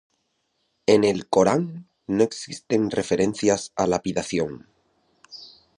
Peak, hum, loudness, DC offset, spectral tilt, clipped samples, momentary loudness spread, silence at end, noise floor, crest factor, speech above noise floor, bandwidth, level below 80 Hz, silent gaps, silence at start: -4 dBFS; none; -23 LUFS; under 0.1%; -5 dB/octave; under 0.1%; 21 LU; 0.3 s; -72 dBFS; 20 dB; 50 dB; 11 kHz; -56 dBFS; none; 0.9 s